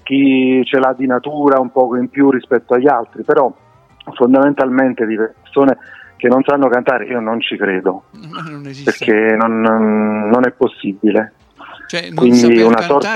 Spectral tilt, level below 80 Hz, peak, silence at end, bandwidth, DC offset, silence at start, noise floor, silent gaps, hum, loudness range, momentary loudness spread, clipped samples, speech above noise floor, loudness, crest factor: -6 dB/octave; -60 dBFS; 0 dBFS; 0 s; 9.4 kHz; under 0.1%; 0.05 s; -37 dBFS; none; none; 2 LU; 10 LU; under 0.1%; 24 dB; -13 LUFS; 14 dB